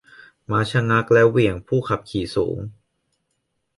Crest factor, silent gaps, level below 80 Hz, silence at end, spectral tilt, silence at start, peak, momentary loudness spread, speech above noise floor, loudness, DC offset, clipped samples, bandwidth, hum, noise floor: 18 dB; none; -48 dBFS; 1.05 s; -7 dB/octave; 0.5 s; -4 dBFS; 11 LU; 54 dB; -20 LUFS; under 0.1%; under 0.1%; 11.5 kHz; none; -74 dBFS